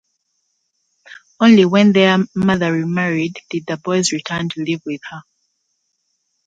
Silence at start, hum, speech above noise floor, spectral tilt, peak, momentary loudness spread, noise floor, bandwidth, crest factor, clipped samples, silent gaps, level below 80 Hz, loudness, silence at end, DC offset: 1.1 s; none; 54 dB; -5.5 dB/octave; 0 dBFS; 15 LU; -70 dBFS; 9.2 kHz; 16 dB; under 0.1%; none; -56 dBFS; -16 LUFS; 1.25 s; under 0.1%